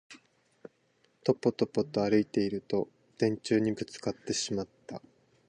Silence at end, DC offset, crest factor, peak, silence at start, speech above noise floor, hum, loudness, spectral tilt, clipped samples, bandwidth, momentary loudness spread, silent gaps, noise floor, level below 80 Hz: 0.5 s; under 0.1%; 20 dB; -12 dBFS; 0.1 s; 41 dB; none; -31 LUFS; -5 dB/octave; under 0.1%; 10 kHz; 14 LU; none; -70 dBFS; -66 dBFS